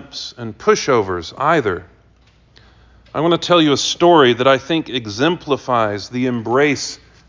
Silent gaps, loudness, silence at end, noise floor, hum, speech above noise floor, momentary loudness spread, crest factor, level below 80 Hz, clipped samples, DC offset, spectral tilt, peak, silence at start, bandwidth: none; -16 LUFS; 0.3 s; -52 dBFS; none; 35 dB; 12 LU; 16 dB; -48 dBFS; under 0.1%; under 0.1%; -4.5 dB/octave; -2 dBFS; 0 s; 7.6 kHz